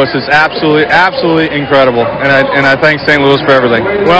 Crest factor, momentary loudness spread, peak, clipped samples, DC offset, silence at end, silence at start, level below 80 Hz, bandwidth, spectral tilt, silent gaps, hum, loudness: 8 dB; 3 LU; 0 dBFS; 1%; under 0.1%; 0 s; 0 s; -38 dBFS; 8 kHz; -6 dB/octave; none; none; -8 LUFS